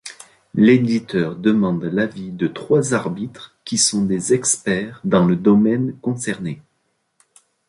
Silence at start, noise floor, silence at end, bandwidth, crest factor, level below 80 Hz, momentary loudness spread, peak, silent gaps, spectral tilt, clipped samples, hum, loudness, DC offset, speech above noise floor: 0.05 s; -69 dBFS; 1.1 s; 11.5 kHz; 16 dB; -54 dBFS; 13 LU; -2 dBFS; none; -5 dB/octave; under 0.1%; none; -18 LUFS; under 0.1%; 51 dB